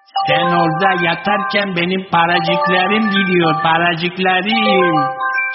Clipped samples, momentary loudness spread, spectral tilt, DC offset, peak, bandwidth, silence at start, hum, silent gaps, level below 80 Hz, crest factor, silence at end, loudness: under 0.1%; 3 LU; -2.5 dB/octave; under 0.1%; 0 dBFS; 6 kHz; 0.15 s; none; none; -56 dBFS; 14 dB; 0 s; -14 LUFS